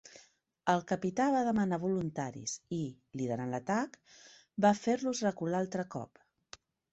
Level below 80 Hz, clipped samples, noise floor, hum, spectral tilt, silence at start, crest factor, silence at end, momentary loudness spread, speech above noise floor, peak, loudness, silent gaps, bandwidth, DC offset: -70 dBFS; under 0.1%; -65 dBFS; none; -5.5 dB/octave; 0.05 s; 20 dB; 0.9 s; 12 LU; 32 dB; -14 dBFS; -33 LUFS; none; 8.2 kHz; under 0.1%